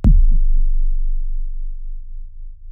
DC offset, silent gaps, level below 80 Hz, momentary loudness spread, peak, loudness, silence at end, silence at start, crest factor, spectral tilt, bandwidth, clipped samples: under 0.1%; none; -14 dBFS; 21 LU; -2 dBFS; -23 LUFS; 0 s; 0 s; 12 dB; -13 dB/octave; 1.3 kHz; under 0.1%